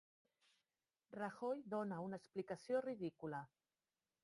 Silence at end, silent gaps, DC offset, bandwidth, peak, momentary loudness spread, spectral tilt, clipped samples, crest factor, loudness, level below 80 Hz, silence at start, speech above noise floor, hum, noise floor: 0.8 s; none; under 0.1%; 11.5 kHz; -30 dBFS; 8 LU; -7 dB/octave; under 0.1%; 18 dB; -47 LUFS; -86 dBFS; 1.1 s; over 44 dB; none; under -90 dBFS